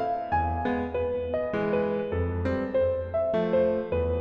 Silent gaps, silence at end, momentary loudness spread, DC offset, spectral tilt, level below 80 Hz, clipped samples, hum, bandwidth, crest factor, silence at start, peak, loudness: none; 0 s; 4 LU; under 0.1%; -9.5 dB/octave; -42 dBFS; under 0.1%; none; 5.8 kHz; 14 dB; 0 s; -14 dBFS; -27 LUFS